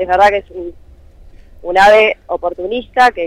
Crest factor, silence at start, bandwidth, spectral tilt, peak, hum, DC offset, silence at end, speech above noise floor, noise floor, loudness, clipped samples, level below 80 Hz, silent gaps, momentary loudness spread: 12 dB; 0 s; 14.5 kHz; -3.5 dB/octave; -2 dBFS; none; under 0.1%; 0 s; 27 dB; -39 dBFS; -12 LUFS; under 0.1%; -40 dBFS; none; 21 LU